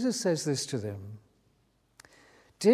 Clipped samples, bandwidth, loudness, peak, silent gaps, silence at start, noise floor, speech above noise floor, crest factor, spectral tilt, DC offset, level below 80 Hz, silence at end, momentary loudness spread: under 0.1%; 15.5 kHz; -31 LUFS; -10 dBFS; none; 0 s; -70 dBFS; 39 dB; 22 dB; -5 dB/octave; under 0.1%; -64 dBFS; 0 s; 19 LU